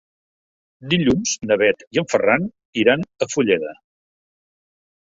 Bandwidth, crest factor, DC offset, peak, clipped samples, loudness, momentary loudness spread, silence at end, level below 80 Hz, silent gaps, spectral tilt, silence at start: 7.8 kHz; 20 dB; under 0.1%; -2 dBFS; under 0.1%; -19 LUFS; 6 LU; 1.3 s; -54 dBFS; 1.87-1.91 s, 2.65-2.73 s; -4.5 dB/octave; 0.8 s